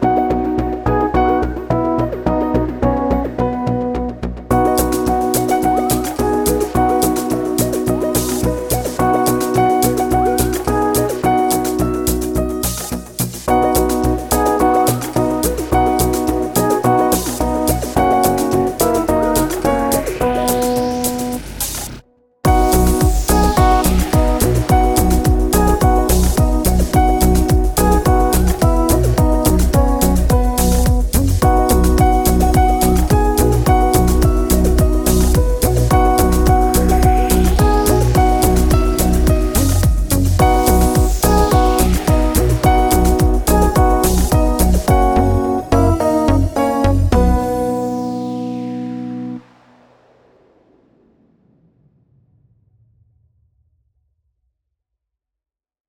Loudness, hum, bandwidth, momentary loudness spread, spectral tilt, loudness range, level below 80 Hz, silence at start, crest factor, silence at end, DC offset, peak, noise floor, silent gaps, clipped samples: -15 LUFS; none; 18.5 kHz; 6 LU; -5.5 dB/octave; 4 LU; -20 dBFS; 0 s; 14 dB; 6.5 s; under 0.1%; 0 dBFS; -87 dBFS; none; under 0.1%